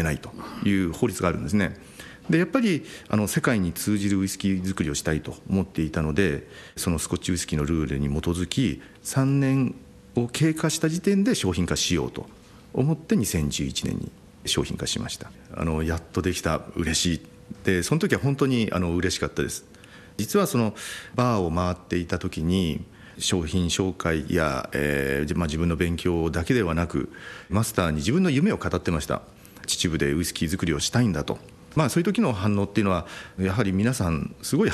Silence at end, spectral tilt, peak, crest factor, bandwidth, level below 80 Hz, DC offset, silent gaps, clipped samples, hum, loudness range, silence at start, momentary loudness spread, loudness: 0 s; -5 dB/octave; -6 dBFS; 18 dB; 13 kHz; -44 dBFS; under 0.1%; none; under 0.1%; none; 2 LU; 0 s; 8 LU; -25 LUFS